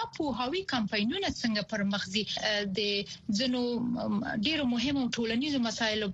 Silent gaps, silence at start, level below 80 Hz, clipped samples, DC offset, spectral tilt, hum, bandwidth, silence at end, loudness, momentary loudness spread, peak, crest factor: none; 0 s; -58 dBFS; under 0.1%; under 0.1%; -4 dB/octave; none; 8.2 kHz; 0 s; -30 LUFS; 3 LU; -14 dBFS; 16 dB